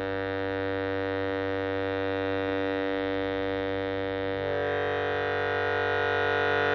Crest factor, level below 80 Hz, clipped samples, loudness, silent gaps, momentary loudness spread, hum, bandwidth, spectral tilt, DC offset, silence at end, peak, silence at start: 14 dB; -56 dBFS; under 0.1%; -29 LUFS; none; 5 LU; none; 6.4 kHz; -7 dB/octave; under 0.1%; 0 s; -14 dBFS; 0 s